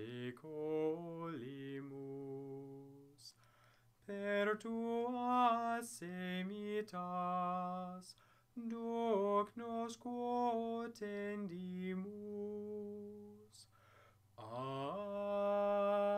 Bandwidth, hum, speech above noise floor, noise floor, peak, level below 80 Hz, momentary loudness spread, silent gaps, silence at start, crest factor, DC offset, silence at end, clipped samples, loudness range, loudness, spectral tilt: 15.5 kHz; none; 29 dB; -70 dBFS; -22 dBFS; -84 dBFS; 19 LU; none; 0 s; 20 dB; under 0.1%; 0 s; under 0.1%; 9 LU; -41 LUFS; -6 dB/octave